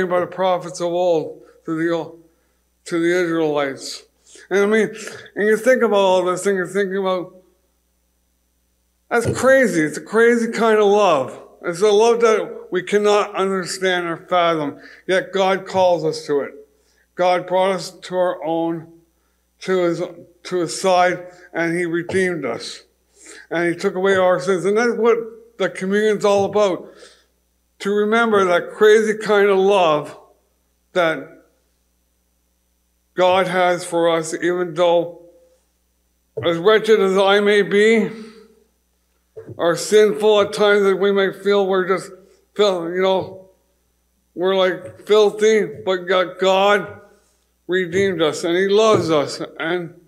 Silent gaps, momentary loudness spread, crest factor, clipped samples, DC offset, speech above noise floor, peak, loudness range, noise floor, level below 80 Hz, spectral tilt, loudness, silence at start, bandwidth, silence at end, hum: none; 13 LU; 16 dB; under 0.1%; under 0.1%; 47 dB; -2 dBFS; 5 LU; -65 dBFS; -66 dBFS; -4.5 dB/octave; -18 LUFS; 0 s; 13.5 kHz; 0.2 s; none